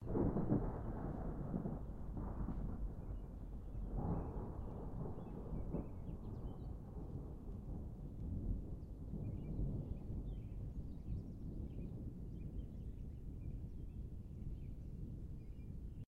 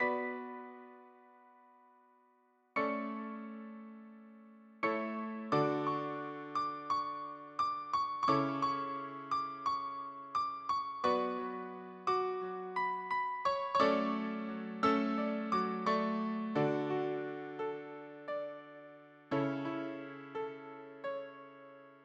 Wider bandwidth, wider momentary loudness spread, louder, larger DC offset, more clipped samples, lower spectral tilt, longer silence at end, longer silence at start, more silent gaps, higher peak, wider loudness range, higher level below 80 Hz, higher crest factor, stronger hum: second, 3.6 kHz vs 8.8 kHz; second, 8 LU vs 17 LU; second, -47 LUFS vs -36 LUFS; neither; neither; first, -11 dB/octave vs -6.5 dB/octave; about the same, 0.05 s vs 0 s; about the same, 0 s vs 0 s; neither; second, -24 dBFS vs -16 dBFS; second, 4 LU vs 8 LU; first, -48 dBFS vs -78 dBFS; about the same, 22 dB vs 22 dB; neither